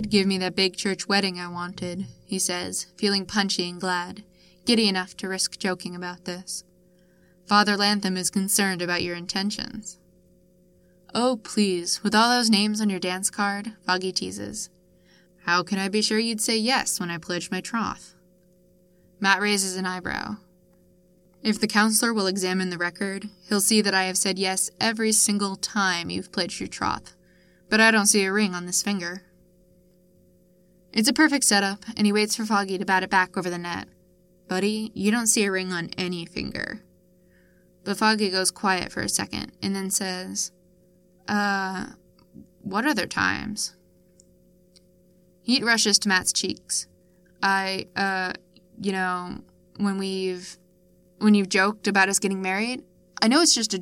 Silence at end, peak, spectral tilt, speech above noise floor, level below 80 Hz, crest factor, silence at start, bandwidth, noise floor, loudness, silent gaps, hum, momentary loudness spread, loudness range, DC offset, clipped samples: 0 s; -4 dBFS; -2.5 dB/octave; 35 dB; -60 dBFS; 22 dB; 0 s; 17 kHz; -59 dBFS; -24 LUFS; none; none; 13 LU; 5 LU; under 0.1%; under 0.1%